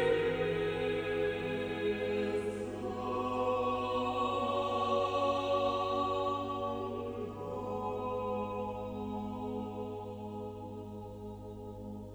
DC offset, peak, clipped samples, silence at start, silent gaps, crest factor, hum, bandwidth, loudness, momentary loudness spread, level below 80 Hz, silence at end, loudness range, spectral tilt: under 0.1%; -20 dBFS; under 0.1%; 0 s; none; 16 dB; none; over 20 kHz; -35 LUFS; 13 LU; -58 dBFS; 0 s; 7 LU; -6.5 dB/octave